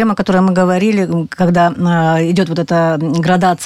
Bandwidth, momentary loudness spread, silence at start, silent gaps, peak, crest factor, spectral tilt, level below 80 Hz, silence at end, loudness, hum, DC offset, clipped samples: 12 kHz; 3 LU; 0 s; none; -2 dBFS; 10 dB; -7 dB/octave; -46 dBFS; 0 s; -13 LUFS; none; under 0.1%; under 0.1%